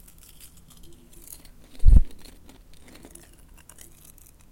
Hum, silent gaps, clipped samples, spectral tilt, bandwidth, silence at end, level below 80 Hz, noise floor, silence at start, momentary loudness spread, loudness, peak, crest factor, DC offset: none; none; under 0.1%; -6.5 dB/octave; 16.5 kHz; 2.45 s; -26 dBFS; -50 dBFS; 1.85 s; 30 LU; -23 LUFS; -4 dBFS; 20 dB; under 0.1%